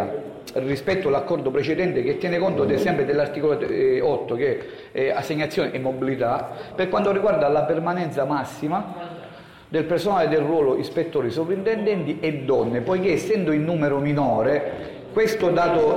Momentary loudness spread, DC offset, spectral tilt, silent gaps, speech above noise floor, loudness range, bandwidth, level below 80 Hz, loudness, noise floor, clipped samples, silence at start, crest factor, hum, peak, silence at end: 8 LU; under 0.1%; -7 dB/octave; none; 21 dB; 2 LU; 16 kHz; -54 dBFS; -22 LUFS; -43 dBFS; under 0.1%; 0 s; 10 dB; none; -12 dBFS; 0 s